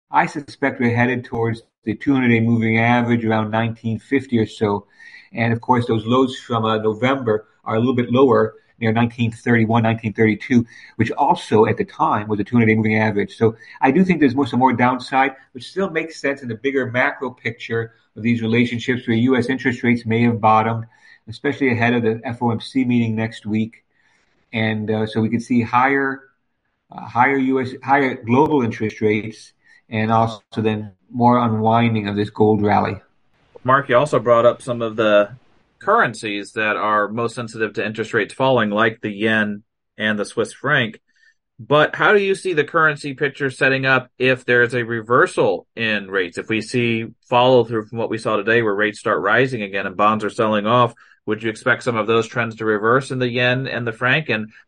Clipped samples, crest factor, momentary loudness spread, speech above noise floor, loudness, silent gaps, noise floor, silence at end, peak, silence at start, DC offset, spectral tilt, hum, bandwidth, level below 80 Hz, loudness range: under 0.1%; 18 dB; 9 LU; 53 dB; -19 LUFS; 1.78-1.82 s; -72 dBFS; 0.2 s; 0 dBFS; 0.1 s; under 0.1%; -6.5 dB/octave; none; 10.5 kHz; -58 dBFS; 3 LU